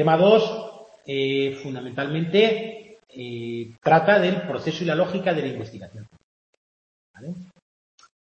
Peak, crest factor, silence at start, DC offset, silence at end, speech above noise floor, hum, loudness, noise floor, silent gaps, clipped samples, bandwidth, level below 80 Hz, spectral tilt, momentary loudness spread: -4 dBFS; 20 dB; 0 s; under 0.1%; 0.85 s; over 68 dB; none; -22 LUFS; under -90 dBFS; 6.24-7.14 s; under 0.1%; 8 kHz; -68 dBFS; -6.5 dB/octave; 23 LU